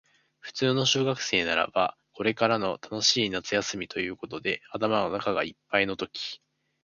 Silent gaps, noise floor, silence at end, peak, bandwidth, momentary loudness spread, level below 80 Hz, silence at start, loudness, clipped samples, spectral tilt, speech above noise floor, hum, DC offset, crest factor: none; -48 dBFS; 0.45 s; -6 dBFS; 7.4 kHz; 10 LU; -62 dBFS; 0.45 s; -27 LUFS; under 0.1%; -3.5 dB/octave; 21 dB; none; under 0.1%; 22 dB